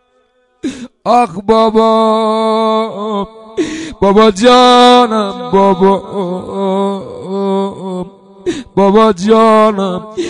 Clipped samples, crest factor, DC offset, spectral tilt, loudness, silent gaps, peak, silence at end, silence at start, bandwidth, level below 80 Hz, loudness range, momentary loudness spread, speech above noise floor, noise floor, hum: 0.2%; 12 dB; under 0.1%; -5.5 dB/octave; -11 LUFS; none; 0 dBFS; 0 s; 0.65 s; 11 kHz; -44 dBFS; 5 LU; 16 LU; 46 dB; -55 dBFS; none